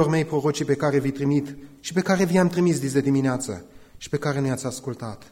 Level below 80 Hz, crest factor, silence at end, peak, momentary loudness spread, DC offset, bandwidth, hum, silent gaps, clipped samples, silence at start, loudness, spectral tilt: -56 dBFS; 16 dB; 0.05 s; -8 dBFS; 13 LU; under 0.1%; 16.5 kHz; none; none; under 0.1%; 0 s; -23 LUFS; -6 dB/octave